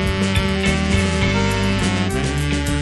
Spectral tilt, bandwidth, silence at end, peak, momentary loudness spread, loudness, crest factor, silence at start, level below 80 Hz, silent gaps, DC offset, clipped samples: -5 dB/octave; 12 kHz; 0 s; -4 dBFS; 3 LU; -19 LUFS; 14 dB; 0 s; -26 dBFS; none; under 0.1%; under 0.1%